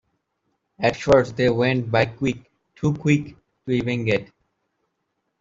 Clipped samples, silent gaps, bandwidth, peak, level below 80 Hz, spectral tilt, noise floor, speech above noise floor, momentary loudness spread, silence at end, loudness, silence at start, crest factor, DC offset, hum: under 0.1%; none; 7.8 kHz; -4 dBFS; -52 dBFS; -6.5 dB/octave; -76 dBFS; 55 dB; 9 LU; 1.15 s; -22 LUFS; 0.8 s; 20 dB; under 0.1%; none